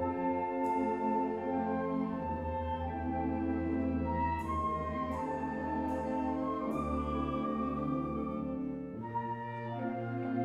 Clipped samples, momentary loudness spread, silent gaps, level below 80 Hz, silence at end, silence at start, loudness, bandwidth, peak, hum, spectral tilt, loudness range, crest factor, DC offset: under 0.1%; 5 LU; none; -50 dBFS; 0 s; 0 s; -35 LUFS; 10.5 kHz; -22 dBFS; none; -9 dB/octave; 2 LU; 12 dB; under 0.1%